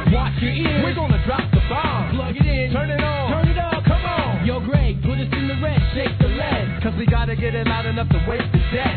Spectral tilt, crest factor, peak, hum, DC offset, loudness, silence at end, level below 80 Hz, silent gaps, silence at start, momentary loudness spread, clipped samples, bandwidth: -10.5 dB/octave; 14 dB; -4 dBFS; none; under 0.1%; -20 LUFS; 0 s; -26 dBFS; none; 0 s; 3 LU; under 0.1%; 4.6 kHz